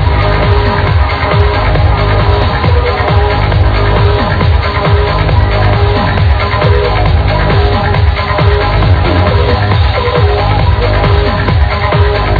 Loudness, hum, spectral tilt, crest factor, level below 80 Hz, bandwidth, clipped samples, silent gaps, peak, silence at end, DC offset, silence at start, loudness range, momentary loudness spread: -10 LUFS; none; -8.5 dB/octave; 8 dB; -14 dBFS; 5.4 kHz; 0.7%; none; 0 dBFS; 0 s; under 0.1%; 0 s; 0 LU; 1 LU